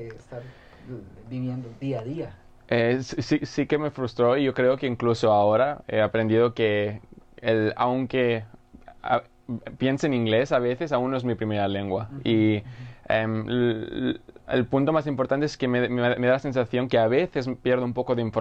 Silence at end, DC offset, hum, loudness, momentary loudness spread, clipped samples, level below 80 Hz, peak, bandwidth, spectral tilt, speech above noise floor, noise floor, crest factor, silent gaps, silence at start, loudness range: 0 s; under 0.1%; none; -25 LUFS; 14 LU; under 0.1%; -54 dBFS; -10 dBFS; 8.4 kHz; -7 dB/octave; 23 dB; -47 dBFS; 16 dB; none; 0 s; 4 LU